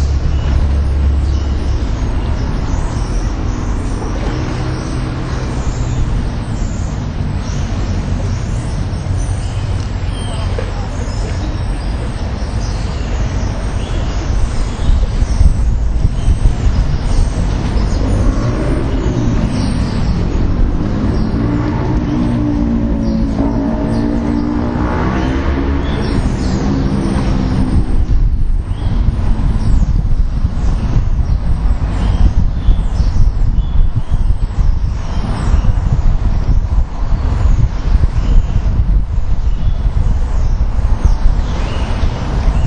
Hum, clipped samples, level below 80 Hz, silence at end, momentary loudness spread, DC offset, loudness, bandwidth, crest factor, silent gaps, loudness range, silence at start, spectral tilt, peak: none; under 0.1%; -14 dBFS; 0 s; 5 LU; under 0.1%; -17 LUFS; 9.4 kHz; 12 dB; none; 4 LU; 0 s; -7 dB/octave; 0 dBFS